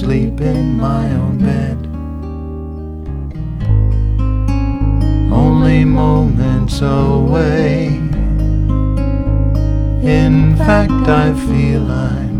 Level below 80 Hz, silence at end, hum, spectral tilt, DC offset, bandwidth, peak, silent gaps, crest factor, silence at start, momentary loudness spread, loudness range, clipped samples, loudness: -18 dBFS; 0 s; none; -8.5 dB/octave; under 0.1%; 11 kHz; 0 dBFS; none; 12 dB; 0 s; 13 LU; 6 LU; under 0.1%; -14 LUFS